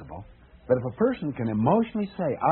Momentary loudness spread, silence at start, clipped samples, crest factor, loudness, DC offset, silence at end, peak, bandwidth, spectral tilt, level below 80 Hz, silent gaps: 8 LU; 0 s; under 0.1%; 18 dB; -26 LUFS; under 0.1%; 0 s; -8 dBFS; 4.2 kHz; -8 dB/octave; -54 dBFS; none